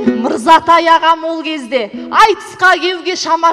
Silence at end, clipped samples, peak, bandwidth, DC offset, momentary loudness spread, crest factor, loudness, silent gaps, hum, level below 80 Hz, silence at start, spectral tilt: 0 s; under 0.1%; 0 dBFS; 15 kHz; under 0.1%; 10 LU; 12 dB; -11 LUFS; none; none; -48 dBFS; 0 s; -2.5 dB/octave